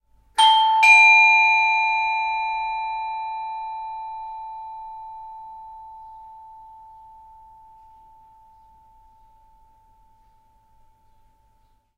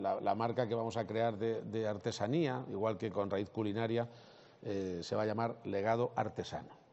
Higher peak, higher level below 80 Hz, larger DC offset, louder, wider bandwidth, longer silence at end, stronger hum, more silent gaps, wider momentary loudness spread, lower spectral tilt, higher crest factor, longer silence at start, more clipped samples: first, -4 dBFS vs -20 dBFS; first, -60 dBFS vs -76 dBFS; neither; first, -16 LUFS vs -37 LUFS; first, 14.5 kHz vs 8 kHz; first, 5.5 s vs 0.15 s; neither; neither; first, 28 LU vs 6 LU; second, 2.5 dB/octave vs -5.5 dB/octave; about the same, 20 dB vs 16 dB; first, 0.35 s vs 0 s; neither